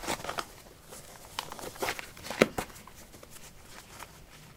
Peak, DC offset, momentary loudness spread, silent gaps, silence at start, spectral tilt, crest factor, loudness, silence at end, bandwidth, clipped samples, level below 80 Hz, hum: -2 dBFS; under 0.1%; 21 LU; none; 0 s; -3.5 dB/octave; 36 dB; -34 LUFS; 0 s; 18 kHz; under 0.1%; -58 dBFS; none